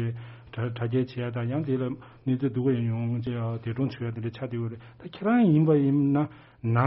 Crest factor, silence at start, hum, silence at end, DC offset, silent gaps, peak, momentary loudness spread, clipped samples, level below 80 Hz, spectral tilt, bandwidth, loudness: 18 dB; 0 s; none; 0 s; under 0.1%; none; -8 dBFS; 13 LU; under 0.1%; -62 dBFS; -8.5 dB/octave; 5.8 kHz; -27 LUFS